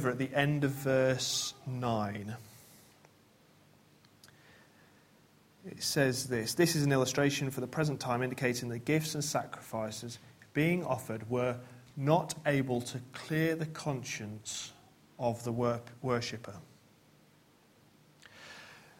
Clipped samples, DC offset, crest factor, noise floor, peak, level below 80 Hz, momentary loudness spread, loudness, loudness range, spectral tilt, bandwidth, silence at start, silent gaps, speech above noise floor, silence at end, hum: under 0.1%; under 0.1%; 22 dB; -64 dBFS; -12 dBFS; -68 dBFS; 17 LU; -33 LUFS; 8 LU; -5 dB/octave; 16.5 kHz; 0 s; none; 31 dB; 0.2 s; none